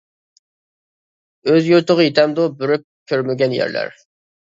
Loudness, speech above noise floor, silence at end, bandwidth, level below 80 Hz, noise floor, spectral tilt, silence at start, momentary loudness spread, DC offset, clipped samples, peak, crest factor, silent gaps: -17 LUFS; over 74 dB; 0.55 s; 7.6 kHz; -68 dBFS; under -90 dBFS; -6.5 dB/octave; 1.45 s; 10 LU; under 0.1%; under 0.1%; 0 dBFS; 18 dB; 2.84-3.06 s